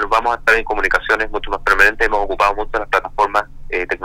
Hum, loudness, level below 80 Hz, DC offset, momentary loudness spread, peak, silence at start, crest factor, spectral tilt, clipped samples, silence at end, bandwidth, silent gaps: none; -16 LUFS; -30 dBFS; under 0.1%; 9 LU; -2 dBFS; 0 s; 16 dB; -3 dB/octave; under 0.1%; 0 s; 16 kHz; none